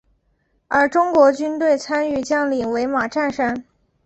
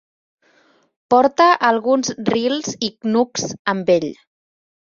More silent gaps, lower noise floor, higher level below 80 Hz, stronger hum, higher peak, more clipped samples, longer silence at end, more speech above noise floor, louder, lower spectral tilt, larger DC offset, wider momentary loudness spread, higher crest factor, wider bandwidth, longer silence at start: second, none vs 3.59-3.65 s; first, -65 dBFS vs -57 dBFS; first, -56 dBFS vs -62 dBFS; neither; about the same, -2 dBFS vs -2 dBFS; neither; second, 0.45 s vs 0.8 s; first, 47 dB vs 40 dB; about the same, -19 LUFS vs -17 LUFS; about the same, -4.5 dB/octave vs -4 dB/octave; neither; about the same, 7 LU vs 9 LU; about the same, 18 dB vs 18 dB; about the same, 8.2 kHz vs 7.6 kHz; second, 0.7 s vs 1.1 s